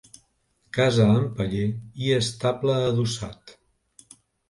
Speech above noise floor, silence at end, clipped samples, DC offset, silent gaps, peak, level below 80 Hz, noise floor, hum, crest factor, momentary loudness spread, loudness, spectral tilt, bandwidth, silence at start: 45 dB; 1 s; under 0.1%; under 0.1%; none; -8 dBFS; -52 dBFS; -68 dBFS; none; 18 dB; 10 LU; -24 LUFS; -6 dB/octave; 11.5 kHz; 0.75 s